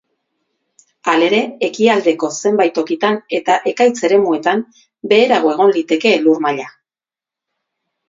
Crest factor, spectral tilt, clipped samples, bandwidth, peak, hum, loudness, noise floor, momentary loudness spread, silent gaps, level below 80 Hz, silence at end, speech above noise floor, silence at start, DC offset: 16 dB; -4 dB/octave; under 0.1%; 7.8 kHz; 0 dBFS; none; -15 LUFS; under -90 dBFS; 8 LU; none; -68 dBFS; 1.4 s; over 76 dB; 1.05 s; under 0.1%